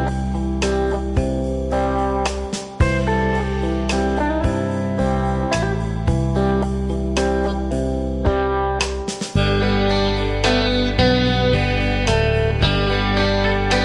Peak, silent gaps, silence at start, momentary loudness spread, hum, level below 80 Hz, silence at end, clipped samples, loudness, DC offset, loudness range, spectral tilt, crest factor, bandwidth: -4 dBFS; none; 0 s; 5 LU; none; -26 dBFS; 0 s; under 0.1%; -20 LUFS; under 0.1%; 3 LU; -5.5 dB/octave; 14 dB; 11.5 kHz